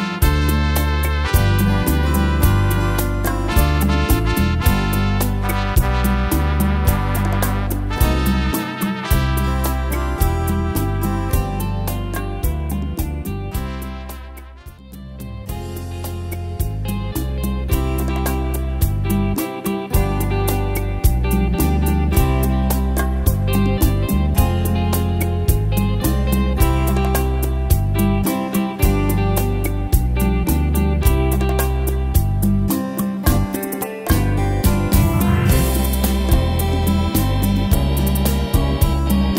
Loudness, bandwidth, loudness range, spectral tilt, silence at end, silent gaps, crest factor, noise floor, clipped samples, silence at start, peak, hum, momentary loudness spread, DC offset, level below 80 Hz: -19 LUFS; 16.5 kHz; 7 LU; -6 dB/octave; 0 s; none; 16 dB; -37 dBFS; under 0.1%; 0 s; 0 dBFS; none; 7 LU; under 0.1%; -22 dBFS